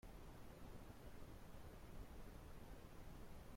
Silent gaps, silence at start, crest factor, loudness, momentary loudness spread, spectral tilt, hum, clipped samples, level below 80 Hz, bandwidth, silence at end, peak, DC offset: none; 0.05 s; 12 dB; -61 LUFS; 1 LU; -5.5 dB/octave; none; under 0.1%; -60 dBFS; 16.5 kHz; 0 s; -44 dBFS; under 0.1%